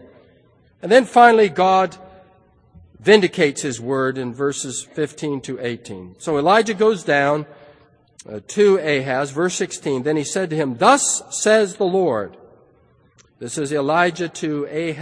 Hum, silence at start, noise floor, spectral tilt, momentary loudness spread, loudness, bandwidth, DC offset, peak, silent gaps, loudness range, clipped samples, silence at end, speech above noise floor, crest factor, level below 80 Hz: none; 0.85 s; -55 dBFS; -4 dB/octave; 13 LU; -18 LUFS; 10.5 kHz; under 0.1%; 0 dBFS; none; 5 LU; under 0.1%; 0 s; 37 dB; 20 dB; -62 dBFS